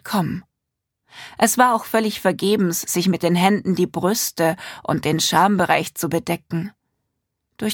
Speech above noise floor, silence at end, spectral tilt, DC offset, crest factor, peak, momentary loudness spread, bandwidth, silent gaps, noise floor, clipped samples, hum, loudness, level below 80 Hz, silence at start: 61 dB; 0 s; -4.5 dB/octave; under 0.1%; 20 dB; -2 dBFS; 12 LU; 19 kHz; none; -80 dBFS; under 0.1%; none; -20 LUFS; -58 dBFS; 0.05 s